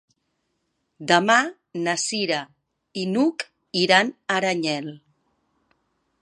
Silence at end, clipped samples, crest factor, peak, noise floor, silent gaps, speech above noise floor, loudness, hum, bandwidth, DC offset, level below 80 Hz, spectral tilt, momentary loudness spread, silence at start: 1.25 s; under 0.1%; 24 dB; 0 dBFS; -74 dBFS; none; 52 dB; -22 LUFS; none; 11.5 kHz; under 0.1%; -74 dBFS; -3.5 dB/octave; 13 LU; 1 s